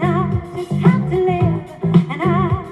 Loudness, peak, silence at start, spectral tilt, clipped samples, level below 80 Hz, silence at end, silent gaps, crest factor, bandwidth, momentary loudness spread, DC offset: -17 LUFS; -2 dBFS; 0 s; -9 dB/octave; under 0.1%; -40 dBFS; 0 s; none; 16 dB; 8.2 kHz; 7 LU; under 0.1%